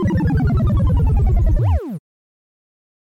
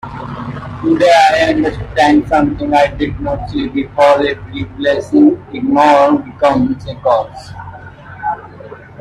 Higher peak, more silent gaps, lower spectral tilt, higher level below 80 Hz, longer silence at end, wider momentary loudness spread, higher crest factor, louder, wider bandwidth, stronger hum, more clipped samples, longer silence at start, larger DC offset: second, -6 dBFS vs 0 dBFS; neither; first, -10 dB/octave vs -6 dB/octave; first, -20 dBFS vs -36 dBFS; first, 1.2 s vs 0 s; second, 7 LU vs 18 LU; about the same, 10 dB vs 14 dB; second, -18 LUFS vs -13 LUFS; second, 6.2 kHz vs 11.5 kHz; neither; neither; about the same, 0 s vs 0.05 s; neither